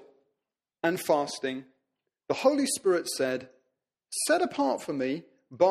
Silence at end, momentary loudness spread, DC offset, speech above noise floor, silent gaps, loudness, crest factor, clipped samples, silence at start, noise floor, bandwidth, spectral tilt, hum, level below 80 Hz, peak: 0 s; 10 LU; under 0.1%; 60 dB; none; -28 LUFS; 20 dB; under 0.1%; 0.85 s; -88 dBFS; 14.5 kHz; -3.5 dB/octave; none; -76 dBFS; -10 dBFS